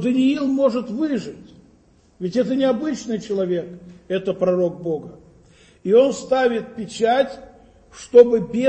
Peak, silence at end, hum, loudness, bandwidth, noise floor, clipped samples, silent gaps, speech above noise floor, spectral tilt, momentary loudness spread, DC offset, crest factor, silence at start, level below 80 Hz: 0 dBFS; 0 s; none; -20 LUFS; 8.8 kHz; -55 dBFS; under 0.1%; none; 36 dB; -6 dB/octave; 14 LU; under 0.1%; 20 dB; 0 s; -56 dBFS